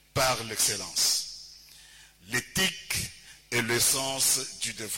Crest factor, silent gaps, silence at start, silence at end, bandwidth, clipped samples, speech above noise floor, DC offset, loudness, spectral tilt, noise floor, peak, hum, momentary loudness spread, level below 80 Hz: 20 dB; none; 0.15 s; 0 s; 16.5 kHz; under 0.1%; 25 dB; under 0.1%; -26 LUFS; -1 dB/octave; -53 dBFS; -10 dBFS; none; 10 LU; -56 dBFS